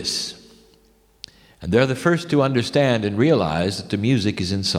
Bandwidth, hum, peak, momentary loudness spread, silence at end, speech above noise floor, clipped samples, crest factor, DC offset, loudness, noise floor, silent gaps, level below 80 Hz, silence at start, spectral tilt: 15.5 kHz; none; -4 dBFS; 19 LU; 0 s; 37 dB; under 0.1%; 18 dB; under 0.1%; -20 LUFS; -57 dBFS; none; -50 dBFS; 0 s; -5.5 dB/octave